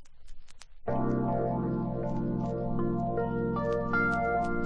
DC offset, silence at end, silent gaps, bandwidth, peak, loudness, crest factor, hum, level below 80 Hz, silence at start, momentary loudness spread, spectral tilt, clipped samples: under 0.1%; 0 s; none; 9.4 kHz; -16 dBFS; -31 LUFS; 14 dB; none; -46 dBFS; 0 s; 5 LU; -9 dB/octave; under 0.1%